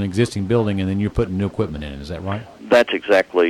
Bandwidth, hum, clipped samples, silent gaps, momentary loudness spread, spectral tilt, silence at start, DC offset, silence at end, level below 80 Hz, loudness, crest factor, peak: 16.5 kHz; none; under 0.1%; none; 13 LU; -6.5 dB/octave; 0 s; under 0.1%; 0 s; -40 dBFS; -20 LUFS; 14 dB; -4 dBFS